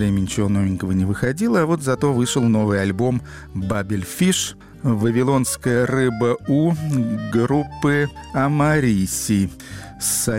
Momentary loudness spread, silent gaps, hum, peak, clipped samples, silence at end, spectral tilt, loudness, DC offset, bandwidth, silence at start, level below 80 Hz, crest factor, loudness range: 7 LU; none; none; -8 dBFS; under 0.1%; 0 s; -5.5 dB/octave; -20 LUFS; 0.1%; 16.5 kHz; 0 s; -44 dBFS; 12 dB; 1 LU